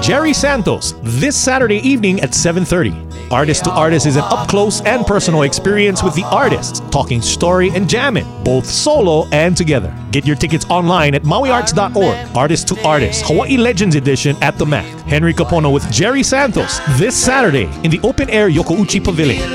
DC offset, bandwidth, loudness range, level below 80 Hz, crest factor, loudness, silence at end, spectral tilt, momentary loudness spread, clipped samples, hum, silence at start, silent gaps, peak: under 0.1%; 15.5 kHz; 1 LU; -32 dBFS; 12 dB; -13 LUFS; 0 s; -4.5 dB/octave; 4 LU; under 0.1%; none; 0 s; none; 0 dBFS